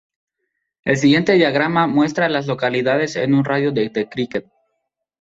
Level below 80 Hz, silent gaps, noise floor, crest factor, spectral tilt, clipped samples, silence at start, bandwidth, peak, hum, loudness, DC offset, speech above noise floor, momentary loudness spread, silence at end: -58 dBFS; none; -75 dBFS; 16 dB; -6 dB/octave; under 0.1%; 0.85 s; 7.8 kHz; -2 dBFS; none; -18 LUFS; under 0.1%; 58 dB; 9 LU; 0.8 s